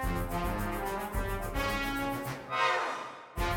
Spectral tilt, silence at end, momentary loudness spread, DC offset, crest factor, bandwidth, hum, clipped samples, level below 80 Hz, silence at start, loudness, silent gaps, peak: -4.5 dB/octave; 0 s; 7 LU; under 0.1%; 16 dB; over 20 kHz; none; under 0.1%; -40 dBFS; 0 s; -33 LUFS; none; -16 dBFS